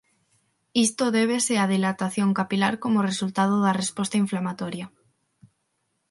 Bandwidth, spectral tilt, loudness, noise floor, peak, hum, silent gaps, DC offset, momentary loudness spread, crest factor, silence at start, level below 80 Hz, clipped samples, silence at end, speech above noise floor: 11.5 kHz; -4.5 dB/octave; -24 LUFS; -74 dBFS; -6 dBFS; none; none; under 0.1%; 8 LU; 18 dB; 0.75 s; -70 dBFS; under 0.1%; 1.2 s; 51 dB